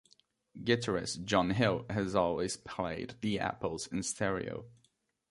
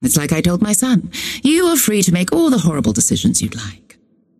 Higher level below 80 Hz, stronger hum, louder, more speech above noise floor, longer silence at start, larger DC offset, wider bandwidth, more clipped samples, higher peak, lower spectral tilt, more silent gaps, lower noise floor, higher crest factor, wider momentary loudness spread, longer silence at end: second, -58 dBFS vs -42 dBFS; neither; second, -34 LUFS vs -15 LUFS; first, 41 dB vs 36 dB; first, 0.55 s vs 0 s; neither; second, 11.5 kHz vs 16 kHz; neither; second, -12 dBFS vs -2 dBFS; about the same, -4.5 dB/octave vs -4 dB/octave; neither; first, -75 dBFS vs -51 dBFS; first, 22 dB vs 14 dB; about the same, 8 LU vs 7 LU; about the same, 0.6 s vs 0.65 s